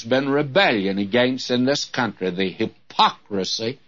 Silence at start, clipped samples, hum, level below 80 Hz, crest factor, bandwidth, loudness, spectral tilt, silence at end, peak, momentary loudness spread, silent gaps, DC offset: 0 s; under 0.1%; none; -64 dBFS; 18 dB; 7.8 kHz; -21 LUFS; -4.5 dB/octave; 0.15 s; -2 dBFS; 7 LU; none; 0.2%